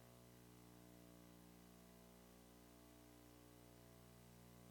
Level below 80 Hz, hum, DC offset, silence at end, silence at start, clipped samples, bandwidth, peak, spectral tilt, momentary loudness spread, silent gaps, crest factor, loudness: -76 dBFS; 60 Hz at -70 dBFS; under 0.1%; 0 s; 0 s; under 0.1%; 18 kHz; -52 dBFS; -5 dB/octave; 1 LU; none; 14 dB; -65 LUFS